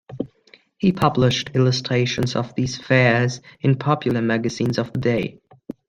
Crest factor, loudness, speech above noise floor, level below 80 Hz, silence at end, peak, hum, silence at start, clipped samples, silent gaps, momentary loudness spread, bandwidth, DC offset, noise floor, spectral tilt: 20 dB; -20 LUFS; 34 dB; -52 dBFS; 0.55 s; -2 dBFS; none; 0.1 s; under 0.1%; none; 8 LU; 9.2 kHz; under 0.1%; -54 dBFS; -6 dB/octave